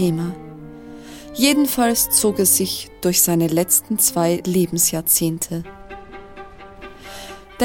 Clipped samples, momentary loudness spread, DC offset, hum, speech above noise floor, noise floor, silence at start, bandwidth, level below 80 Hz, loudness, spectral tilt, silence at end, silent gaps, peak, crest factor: under 0.1%; 23 LU; 0.2%; none; 20 dB; -39 dBFS; 0 s; 17 kHz; -48 dBFS; -17 LUFS; -3.5 dB/octave; 0 s; none; 0 dBFS; 20 dB